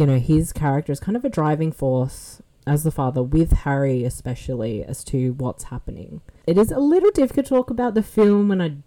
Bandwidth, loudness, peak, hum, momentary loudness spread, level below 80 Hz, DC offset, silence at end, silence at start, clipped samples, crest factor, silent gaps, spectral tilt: 18 kHz; -21 LUFS; -8 dBFS; none; 15 LU; -32 dBFS; under 0.1%; 0.05 s; 0 s; under 0.1%; 12 dB; none; -7.5 dB/octave